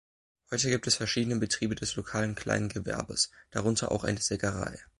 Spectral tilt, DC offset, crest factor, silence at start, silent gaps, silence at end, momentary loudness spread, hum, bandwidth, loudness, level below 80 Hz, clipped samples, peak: -3.5 dB/octave; under 0.1%; 20 dB; 0.5 s; none; 0.15 s; 6 LU; none; 11.5 kHz; -30 LUFS; -52 dBFS; under 0.1%; -12 dBFS